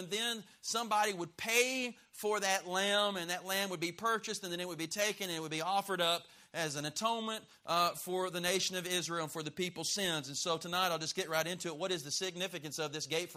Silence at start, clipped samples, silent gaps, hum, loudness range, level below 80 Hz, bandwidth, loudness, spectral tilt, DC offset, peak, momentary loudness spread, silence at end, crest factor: 0 s; under 0.1%; none; none; 2 LU; -78 dBFS; 15.5 kHz; -35 LUFS; -2 dB/octave; under 0.1%; -14 dBFS; 7 LU; 0 s; 22 dB